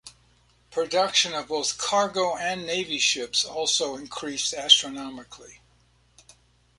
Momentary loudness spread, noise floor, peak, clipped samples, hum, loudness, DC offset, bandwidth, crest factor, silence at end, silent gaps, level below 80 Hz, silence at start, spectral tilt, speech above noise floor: 16 LU; -62 dBFS; -2 dBFS; under 0.1%; 60 Hz at -60 dBFS; -23 LUFS; under 0.1%; 11.5 kHz; 24 dB; 1.25 s; none; -64 dBFS; 0.05 s; -0.5 dB/octave; 36 dB